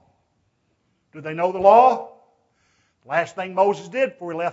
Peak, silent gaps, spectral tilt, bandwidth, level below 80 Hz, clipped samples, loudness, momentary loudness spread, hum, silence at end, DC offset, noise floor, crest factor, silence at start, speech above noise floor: 0 dBFS; none; -6 dB/octave; 8 kHz; -66 dBFS; under 0.1%; -19 LUFS; 17 LU; none; 0 s; under 0.1%; -68 dBFS; 20 dB; 1.15 s; 49 dB